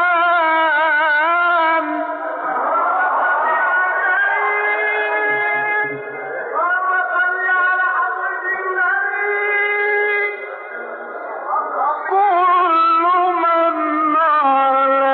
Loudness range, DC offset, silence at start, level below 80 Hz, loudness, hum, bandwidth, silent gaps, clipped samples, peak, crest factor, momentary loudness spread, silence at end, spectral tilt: 4 LU; under 0.1%; 0 s; -82 dBFS; -16 LUFS; none; 4.7 kHz; none; under 0.1%; -8 dBFS; 10 dB; 9 LU; 0 s; 0.5 dB/octave